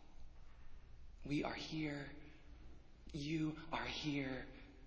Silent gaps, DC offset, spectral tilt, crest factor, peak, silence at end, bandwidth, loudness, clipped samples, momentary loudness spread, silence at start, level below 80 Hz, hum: none; under 0.1%; -5.5 dB/octave; 20 dB; -26 dBFS; 0 s; 8 kHz; -44 LUFS; under 0.1%; 22 LU; 0 s; -60 dBFS; none